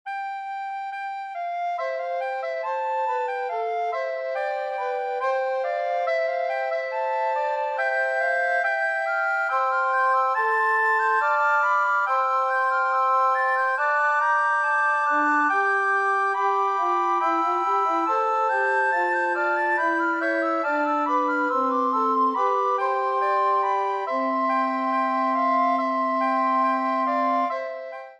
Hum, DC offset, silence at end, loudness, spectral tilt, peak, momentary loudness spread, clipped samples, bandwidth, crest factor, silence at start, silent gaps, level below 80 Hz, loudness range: none; under 0.1%; 0.05 s; -23 LUFS; -2.5 dB/octave; -10 dBFS; 7 LU; under 0.1%; 10 kHz; 12 dB; 0.05 s; none; -88 dBFS; 6 LU